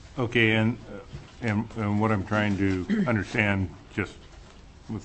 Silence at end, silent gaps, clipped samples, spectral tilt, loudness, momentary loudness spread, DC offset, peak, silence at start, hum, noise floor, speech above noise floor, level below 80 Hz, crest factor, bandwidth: 0 s; none; under 0.1%; -7 dB/octave; -26 LUFS; 15 LU; under 0.1%; -6 dBFS; 0 s; none; -48 dBFS; 22 dB; -50 dBFS; 22 dB; 8.6 kHz